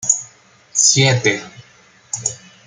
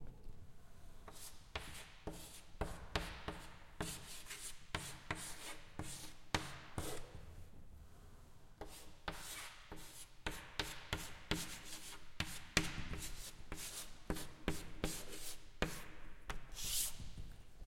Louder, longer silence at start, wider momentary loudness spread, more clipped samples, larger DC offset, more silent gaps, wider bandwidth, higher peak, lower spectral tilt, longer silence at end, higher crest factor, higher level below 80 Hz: first, -15 LUFS vs -46 LUFS; about the same, 0 s vs 0 s; second, 14 LU vs 17 LU; neither; neither; neither; second, 10.5 kHz vs 16.5 kHz; first, 0 dBFS vs -10 dBFS; about the same, -2.5 dB/octave vs -3 dB/octave; first, 0.3 s vs 0 s; second, 18 dB vs 36 dB; about the same, -58 dBFS vs -54 dBFS